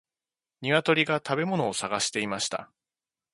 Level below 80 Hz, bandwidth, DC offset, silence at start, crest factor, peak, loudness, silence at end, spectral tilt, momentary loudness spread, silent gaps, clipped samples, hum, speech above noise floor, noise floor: -70 dBFS; 11.5 kHz; under 0.1%; 0.6 s; 22 dB; -6 dBFS; -27 LUFS; 0.7 s; -3.5 dB/octave; 8 LU; none; under 0.1%; none; over 63 dB; under -90 dBFS